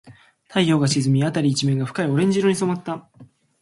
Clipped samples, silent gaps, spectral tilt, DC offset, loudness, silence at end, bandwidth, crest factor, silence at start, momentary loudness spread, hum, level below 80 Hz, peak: under 0.1%; none; -5.5 dB/octave; under 0.1%; -20 LUFS; 0.35 s; 11.5 kHz; 18 dB; 0.05 s; 8 LU; none; -60 dBFS; -4 dBFS